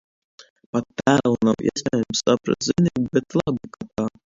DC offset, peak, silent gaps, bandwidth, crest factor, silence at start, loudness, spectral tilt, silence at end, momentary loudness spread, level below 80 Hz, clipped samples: under 0.1%; 0 dBFS; 0.50-0.56 s, 0.66-0.73 s; 7.8 kHz; 22 dB; 0.4 s; -22 LUFS; -5.5 dB/octave; 0.2 s; 9 LU; -54 dBFS; under 0.1%